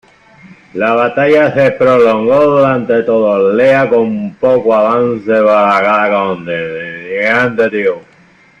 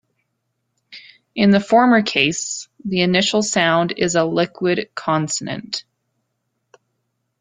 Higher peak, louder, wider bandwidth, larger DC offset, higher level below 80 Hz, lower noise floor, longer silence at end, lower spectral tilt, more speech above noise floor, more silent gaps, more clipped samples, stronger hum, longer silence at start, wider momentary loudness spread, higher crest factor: about the same, 0 dBFS vs -2 dBFS; first, -11 LUFS vs -18 LUFS; second, 7.8 kHz vs 9.6 kHz; neither; first, -52 dBFS vs -58 dBFS; second, -45 dBFS vs -73 dBFS; second, 0.6 s vs 1.6 s; first, -7 dB/octave vs -4 dB/octave; second, 35 dB vs 56 dB; neither; neither; neither; second, 0.45 s vs 0.9 s; second, 9 LU vs 13 LU; second, 10 dB vs 18 dB